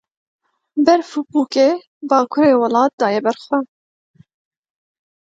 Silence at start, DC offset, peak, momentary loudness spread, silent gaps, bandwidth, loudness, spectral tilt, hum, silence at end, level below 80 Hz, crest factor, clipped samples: 0.75 s; under 0.1%; 0 dBFS; 8 LU; 1.87-2.01 s, 2.93-2.98 s; 7.8 kHz; -17 LUFS; -5 dB/octave; none; 1.65 s; -66 dBFS; 18 dB; under 0.1%